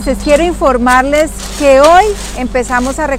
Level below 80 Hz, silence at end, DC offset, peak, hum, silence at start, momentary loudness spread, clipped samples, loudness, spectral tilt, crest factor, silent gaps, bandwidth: -24 dBFS; 0 s; under 0.1%; 0 dBFS; none; 0 s; 10 LU; 0.2%; -10 LUFS; -4 dB/octave; 10 dB; none; 16 kHz